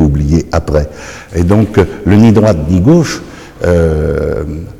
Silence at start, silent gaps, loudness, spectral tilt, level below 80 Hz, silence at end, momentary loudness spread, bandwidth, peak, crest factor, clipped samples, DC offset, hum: 0 s; none; -11 LUFS; -7.5 dB/octave; -22 dBFS; 0 s; 13 LU; 14 kHz; 0 dBFS; 10 dB; under 0.1%; under 0.1%; none